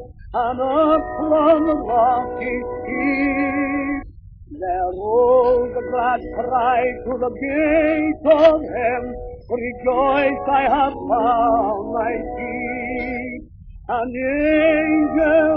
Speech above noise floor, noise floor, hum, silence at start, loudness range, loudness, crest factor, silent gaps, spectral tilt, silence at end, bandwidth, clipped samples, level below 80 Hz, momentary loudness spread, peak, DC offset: 21 dB; -39 dBFS; none; 0 s; 3 LU; -19 LUFS; 18 dB; none; -4 dB/octave; 0 s; 5.4 kHz; under 0.1%; -42 dBFS; 11 LU; -2 dBFS; under 0.1%